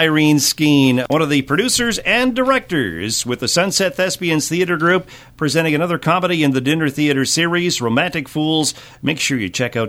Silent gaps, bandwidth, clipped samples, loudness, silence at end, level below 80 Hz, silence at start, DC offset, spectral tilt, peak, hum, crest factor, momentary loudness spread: none; 16.5 kHz; under 0.1%; -16 LUFS; 0 s; -48 dBFS; 0 s; under 0.1%; -4 dB/octave; -2 dBFS; none; 14 dB; 6 LU